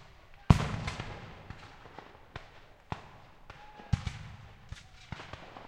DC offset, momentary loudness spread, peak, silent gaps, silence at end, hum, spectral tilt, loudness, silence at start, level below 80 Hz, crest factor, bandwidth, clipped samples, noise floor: under 0.1%; 26 LU; -4 dBFS; none; 0 s; none; -6.5 dB/octave; -34 LUFS; 0 s; -44 dBFS; 32 dB; 12 kHz; under 0.1%; -54 dBFS